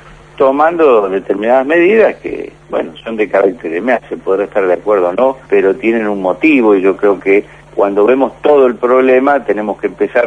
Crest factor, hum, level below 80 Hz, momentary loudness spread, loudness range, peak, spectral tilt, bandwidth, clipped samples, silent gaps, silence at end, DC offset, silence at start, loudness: 12 dB; none; -48 dBFS; 9 LU; 3 LU; 0 dBFS; -7 dB/octave; 7.8 kHz; under 0.1%; none; 0 s; under 0.1%; 0.4 s; -12 LUFS